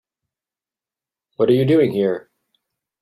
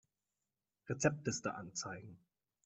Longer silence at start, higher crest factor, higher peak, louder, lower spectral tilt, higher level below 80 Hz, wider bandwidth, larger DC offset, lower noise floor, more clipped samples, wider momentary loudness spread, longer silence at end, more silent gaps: first, 1.4 s vs 0.85 s; second, 18 dB vs 26 dB; first, -4 dBFS vs -18 dBFS; first, -17 LUFS vs -40 LUFS; first, -8.5 dB/octave vs -4.5 dB/octave; first, -60 dBFS vs -74 dBFS; first, 12.5 kHz vs 8.2 kHz; neither; about the same, under -90 dBFS vs under -90 dBFS; neither; second, 8 LU vs 19 LU; first, 0.8 s vs 0.5 s; neither